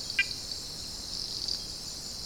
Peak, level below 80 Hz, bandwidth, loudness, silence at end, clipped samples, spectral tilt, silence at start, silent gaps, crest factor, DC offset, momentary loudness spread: -12 dBFS; -52 dBFS; 18 kHz; -33 LUFS; 0 s; under 0.1%; -0.5 dB/octave; 0 s; none; 24 dB; 0.1%; 8 LU